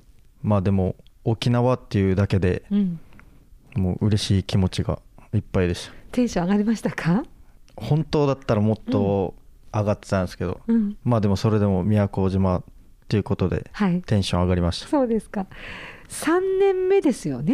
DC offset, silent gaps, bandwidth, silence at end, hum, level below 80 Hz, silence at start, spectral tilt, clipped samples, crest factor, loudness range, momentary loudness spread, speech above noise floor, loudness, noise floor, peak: under 0.1%; none; 14.5 kHz; 0 s; none; -44 dBFS; 0.45 s; -7 dB/octave; under 0.1%; 12 dB; 2 LU; 9 LU; 27 dB; -23 LUFS; -49 dBFS; -10 dBFS